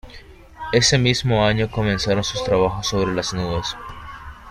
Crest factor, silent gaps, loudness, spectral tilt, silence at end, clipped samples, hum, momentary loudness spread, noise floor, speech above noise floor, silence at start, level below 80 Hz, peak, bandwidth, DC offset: 18 dB; none; -20 LUFS; -4.5 dB/octave; 0 s; under 0.1%; none; 19 LU; -42 dBFS; 23 dB; 0.05 s; -38 dBFS; -2 dBFS; 13.5 kHz; under 0.1%